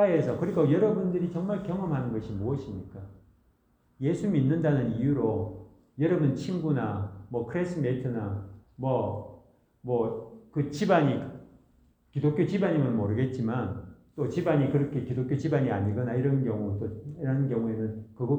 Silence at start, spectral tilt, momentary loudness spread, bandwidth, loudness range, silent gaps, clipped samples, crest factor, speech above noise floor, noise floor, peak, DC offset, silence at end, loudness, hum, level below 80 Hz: 0 s; -9 dB/octave; 14 LU; 8.6 kHz; 4 LU; none; under 0.1%; 18 dB; 40 dB; -67 dBFS; -10 dBFS; under 0.1%; 0 s; -29 LUFS; none; -58 dBFS